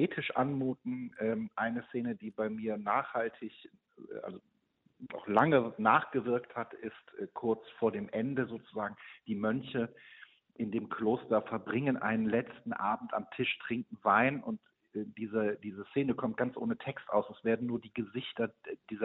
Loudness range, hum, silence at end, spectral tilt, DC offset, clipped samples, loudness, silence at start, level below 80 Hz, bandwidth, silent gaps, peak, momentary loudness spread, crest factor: 5 LU; none; 0 s; -5 dB/octave; under 0.1%; under 0.1%; -34 LUFS; 0 s; -74 dBFS; 4.1 kHz; none; -10 dBFS; 16 LU; 24 dB